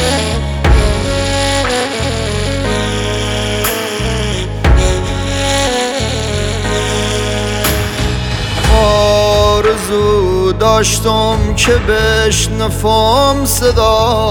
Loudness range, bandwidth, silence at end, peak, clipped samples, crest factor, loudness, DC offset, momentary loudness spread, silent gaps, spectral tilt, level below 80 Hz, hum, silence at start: 4 LU; 18 kHz; 0 s; 0 dBFS; under 0.1%; 12 dB; -13 LUFS; under 0.1%; 6 LU; none; -4 dB/octave; -20 dBFS; none; 0 s